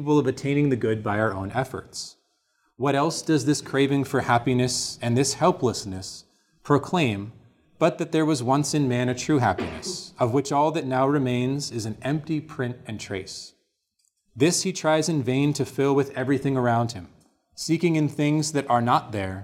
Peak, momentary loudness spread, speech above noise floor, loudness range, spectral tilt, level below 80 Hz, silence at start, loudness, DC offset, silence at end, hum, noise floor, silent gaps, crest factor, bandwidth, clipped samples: -4 dBFS; 11 LU; 48 dB; 3 LU; -5.5 dB/octave; -60 dBFS; 0 s; -24 LUFS; under 0.1%; 0 s; none; -72 dBFS; none; 20 dB; 16 kHz; under 0.1%